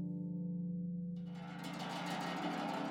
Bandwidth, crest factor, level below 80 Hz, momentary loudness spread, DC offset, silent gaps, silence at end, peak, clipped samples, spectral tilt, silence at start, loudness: 15.5 kHz; 14 dB; -76 dBFS; 6 LU; under 0.1%; none; 0 s; -28 dBFS; under 0.1%; -6 dB/octave; 0 s; -42 LUFS